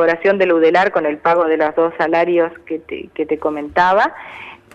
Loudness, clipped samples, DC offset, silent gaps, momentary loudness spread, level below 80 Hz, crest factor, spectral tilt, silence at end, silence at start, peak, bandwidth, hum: -16 LUFS; under 0.1%; under 0.1%; none; 14 LU; -54 dBFS; 12 dB; -6.5 dB/octave; 0.2 s; 0 s; -4 dBFS; 7.6 kHz; none